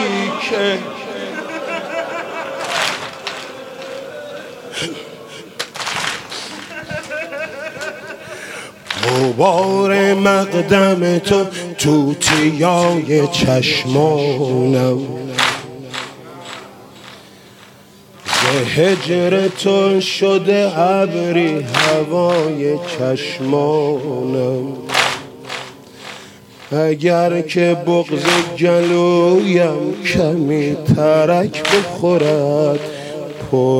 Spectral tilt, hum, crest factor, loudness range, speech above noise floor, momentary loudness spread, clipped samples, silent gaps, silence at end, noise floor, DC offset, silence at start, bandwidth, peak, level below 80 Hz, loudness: -5 dB/octave; none; 16 dB; 10 LU; 28 dB; 16 LU; under 0.1%; none; 0 s; -43 dBFS; under 0.1%; 0 s; 16.5 kHz; 0 dBFS; -52 dBFS; -16 LUFS